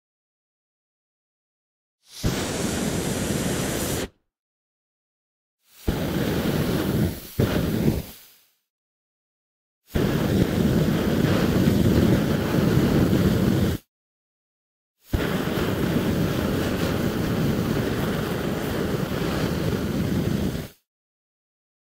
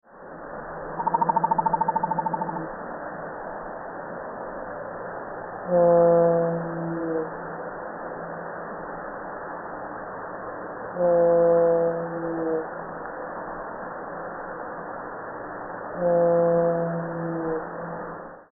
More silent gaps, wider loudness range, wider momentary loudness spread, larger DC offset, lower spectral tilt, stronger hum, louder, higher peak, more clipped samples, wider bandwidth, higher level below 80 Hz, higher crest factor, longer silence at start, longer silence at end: first, 4.39-5.58 s, 8.70-9.82 s, 13.88-14.95 s vs none; second, 8 LU vs 11 LU; second, 8 LU vs 16 LU; neither; first, -6 dB/octave vs -3 dB/octave; neither; about the same, -24 LUFS vs -26 LUFS; about the same, -6 dBFS vs -8 dBFS; neither; first, 16 kHz vs 2.1 kHz; first, -38 dBFS vs -56 dBFS; about the same, 18 dB vs 18 dB; first, 2.1 s vs 0.1 s; first, 1.1 s vs 0.1 s